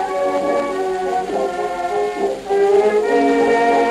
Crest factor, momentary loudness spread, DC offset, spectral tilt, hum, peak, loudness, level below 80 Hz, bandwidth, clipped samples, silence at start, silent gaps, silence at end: 12 dB; 7 LU; under 0.1%; -4.5 dB/octave; none; -4 dBFS; -17 LUFS; -52 dBFS; 12.5 kHz; under 0.1%; 0 s; none; 0 s